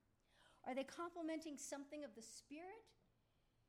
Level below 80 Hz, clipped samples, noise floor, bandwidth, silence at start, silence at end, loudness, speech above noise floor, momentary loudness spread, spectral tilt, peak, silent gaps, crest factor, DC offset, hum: -84 dBFS; under 0.1%; -81 dBFS; 16 kHz; 0.35 s; 0.75 s; -51 LUFS; 30 dB; 10 LU; -2.5 dB/octave; -36 dBFS; none; 18 dB; under 0.1%; none